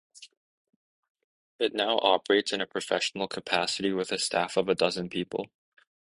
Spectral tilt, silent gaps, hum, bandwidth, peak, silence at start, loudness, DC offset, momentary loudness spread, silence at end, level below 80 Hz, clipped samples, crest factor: -3 dB/octave; 0.37-0.65 s, 0.76-1.03 s, 1.10-1.15 s, 1.24-1.59 s; none; 11.5 kHz; -6 dBFS; 0.15 s; -28 LUFS; under 0.1%; 8 LU; 0.75 s; -68 dBFS; under 0.1%; 24 dB